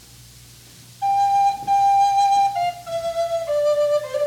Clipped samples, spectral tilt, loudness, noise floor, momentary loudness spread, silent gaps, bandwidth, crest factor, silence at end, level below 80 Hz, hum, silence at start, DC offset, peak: under 0.1%; -2.5 dB/octave; -19 LUFS; -45 dBFS; 9 LU; none; 17 kHz; 10 dB; 0 s; -56 dBFS; none; 1 s; under 0.1%; -10 dBFS